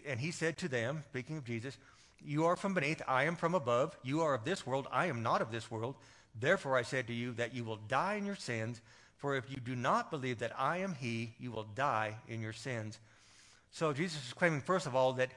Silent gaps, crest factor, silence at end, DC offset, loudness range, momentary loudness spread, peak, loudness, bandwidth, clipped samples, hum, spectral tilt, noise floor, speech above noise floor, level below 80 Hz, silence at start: none; 22 dB; 0 s; under 0.1%; 4 LU; 11 LU; -16 dBFS; -36 LUFS; 11.5 kHz; under 0.1%; none; -5.5 dB/octave; -63 dBFS; 27 dB; -74 dBFS; 0.05 s